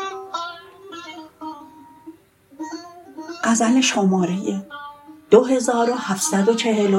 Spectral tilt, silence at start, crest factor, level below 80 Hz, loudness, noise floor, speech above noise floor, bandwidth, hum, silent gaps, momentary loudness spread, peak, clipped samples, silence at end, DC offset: -4.5 dB/octave; 0 s; 20 dB; -66 dBFS; -19 LUFS; -48 dBFS; 31 dB; 16.5 kHz; none; none; 22 LU; 0 dBFS; under 0.1%; 0 s; under 0.1%